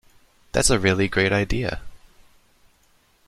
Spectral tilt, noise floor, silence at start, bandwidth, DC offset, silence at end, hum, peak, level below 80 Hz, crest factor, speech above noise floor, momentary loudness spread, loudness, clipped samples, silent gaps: -4 dB/octave; -60 dBFS; 0.55 s; 14.5 kHz; under 0.1%; 1.3 s; none; -4 dBFS; -38 dBFS; 22 dB; 40 dB; 10 LU; -21 LUFS; under 0.1%; none